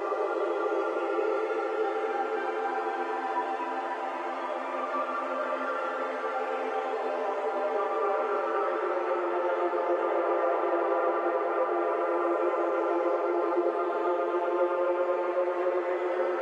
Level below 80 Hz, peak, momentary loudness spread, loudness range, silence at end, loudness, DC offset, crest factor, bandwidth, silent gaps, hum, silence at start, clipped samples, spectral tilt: under -90 dBFS; -14 dBFS; 4 LU; 4 LU; 0 s; -29 LUFS; under 0.1%; 14 dB; 8.8 kHz; none; none; 0 s; under 0.1%; -3.5 dB/octave